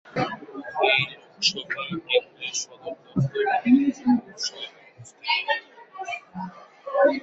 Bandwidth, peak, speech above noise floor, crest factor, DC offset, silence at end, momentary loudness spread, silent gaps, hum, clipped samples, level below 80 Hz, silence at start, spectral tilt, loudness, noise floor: 8 kHz; -6 dBFS; 24 dB; 20 dB; under 0.1%; 0 s; 17 LU; none; none; under 0.1%; -64 dBFS; 0.05 s; -4 dB/octave; -25 LUFS; -48 dBFS